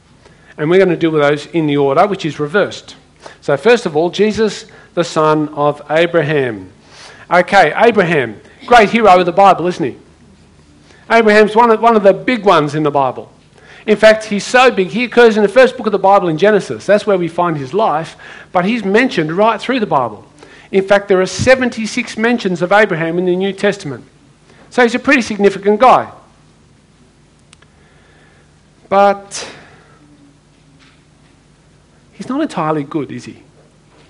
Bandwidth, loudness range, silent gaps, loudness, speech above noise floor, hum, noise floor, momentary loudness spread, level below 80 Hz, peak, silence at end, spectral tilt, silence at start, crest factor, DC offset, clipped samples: 11 kHz; 9 LU; none; -12 LUFS; 36 dB; none; -48 dBFS; 13 LU; -48 dBFS; 0 dBFS; 0.75 s; -5.5 dB/octave; 0.6 s; 14 dB; under 0.1%; 0.3%